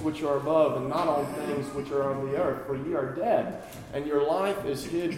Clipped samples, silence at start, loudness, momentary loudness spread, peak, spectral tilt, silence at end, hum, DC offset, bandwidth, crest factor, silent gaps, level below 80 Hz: under 0.1%; 0 s; -28 LUFS; 8 LU; -12 dBFS; -6.5 dB/octave; 0 s; none; under 0.1%; 16.5 kHz; 16 dB; none; -58 dBFS